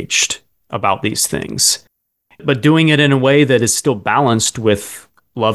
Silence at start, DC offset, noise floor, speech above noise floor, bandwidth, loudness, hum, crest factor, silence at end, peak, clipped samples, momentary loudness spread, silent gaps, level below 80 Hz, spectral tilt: 0 s; under 0.1%; -56 dBFS; 42 dB; 13 kHz; -14 LUFS; none; 14 dB; 0 s; 0 dBFS; under 0.1%; 13 LU; none; -48 dBFS; -3.5 dB/octave